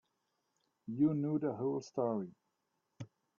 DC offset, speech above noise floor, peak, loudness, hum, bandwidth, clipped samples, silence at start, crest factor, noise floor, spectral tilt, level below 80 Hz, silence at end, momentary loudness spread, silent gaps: under 0.1%; 49 dB; -20 dBFS; -36 LUFS; none; 7.4 kHz; under 0.1%; 0.85 s; 18 dB; -84 dBFS; -9 dB/octave; -80 dBFS; 0.35 s; 21 LU; none